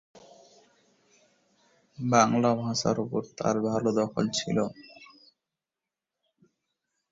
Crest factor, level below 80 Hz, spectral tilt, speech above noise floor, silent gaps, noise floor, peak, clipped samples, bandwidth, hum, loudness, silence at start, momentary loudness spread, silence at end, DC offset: 24 dB; -66 dBFS; -5 dB/octave; 63 dB; none; -90 dBFS; -6 dBFS; under 0.1%; 7.8 kHz; none; -27 LUFS; 0.15 s; 12 LU; 2.05 s; under 0.1%